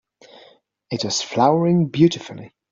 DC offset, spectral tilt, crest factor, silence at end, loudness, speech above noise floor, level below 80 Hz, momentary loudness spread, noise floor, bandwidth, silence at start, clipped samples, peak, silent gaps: under 0.1%; -5.5 dB/octave; 18 dB; 0.25 s; -19 LUFS; 34 dB; -62 dBFS; 16 LU; -53 dBFS; 7.6 kHz; 0.9 s; under 0.1%; -4 dBFS; none